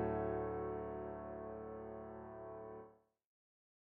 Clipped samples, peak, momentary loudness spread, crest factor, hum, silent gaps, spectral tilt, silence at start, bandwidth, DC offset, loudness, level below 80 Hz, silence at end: under 0.1%; -28 dBFS; 12 LU; 18 dB; none; none; -9 dB/octave; 0 s; 3.6 kHz; under 0.1%; -46 LUFS; -62 dBFS; 0.95 s